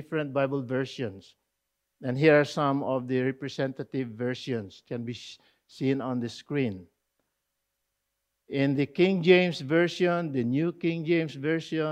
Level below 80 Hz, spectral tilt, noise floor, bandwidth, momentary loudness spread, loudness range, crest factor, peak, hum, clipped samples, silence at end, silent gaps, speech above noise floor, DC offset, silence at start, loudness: -74 dBFS; -7 dB/octave; -82 dBFS; 9.6 kHz; 14 LU; 9 LU; 22 dB; -6 dBFS; none; under 0.1%; 0 s; none; 54 dB; under 0.1%; 0 s; -27 LUFS